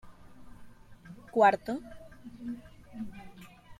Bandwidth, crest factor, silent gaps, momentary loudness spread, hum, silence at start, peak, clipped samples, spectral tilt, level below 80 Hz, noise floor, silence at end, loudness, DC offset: 14.5 kHz; 24 dB; none; 27 LU; none; 0.05 s; -10 dBFS; under 0.1%; -6 dB/octave; -60 dBFS; -51 dBFS; 0.05 s; -29 LUFS; under 0.1%